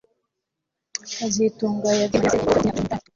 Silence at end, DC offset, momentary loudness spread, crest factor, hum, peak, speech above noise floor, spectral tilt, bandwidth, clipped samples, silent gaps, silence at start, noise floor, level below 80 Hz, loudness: 0.15 s; under 0.1%; 11 LU; 18 dB; none; -6 dBFS; 61 dB; -4.5 dB/octave; 8 kHz; under 0.1%; none; 1.05 s; -82 dBFS; -48 dBFS; -22 LUFS